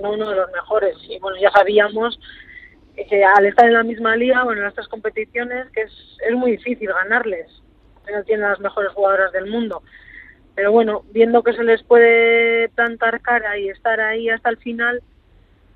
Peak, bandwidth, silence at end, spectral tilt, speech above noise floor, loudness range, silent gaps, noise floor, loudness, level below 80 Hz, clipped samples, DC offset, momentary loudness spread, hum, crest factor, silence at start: 0 dBFS; 4.8 kHz; 0.75 s; -6 dB/octave; 35 dB; 7 LU; none; -52 dBFS; -17 LUFS; -54 dBFS; under 0.1%; under 0.1%; 14 LU; none; 18 dB; 0 s